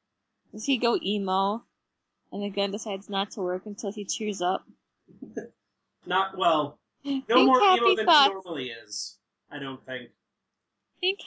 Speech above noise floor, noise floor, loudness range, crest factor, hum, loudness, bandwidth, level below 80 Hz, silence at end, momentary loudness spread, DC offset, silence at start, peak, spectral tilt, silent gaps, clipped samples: 57 dB; -83 dBFS; 8 LU; 20 dB; none; -26 LUFS; 8 kHz; -78 dBFS; 0 s; 19 LU; under 0.1%; 0.55 s; -8 dBFS; -3.5 dB/octave; none; under 0.1%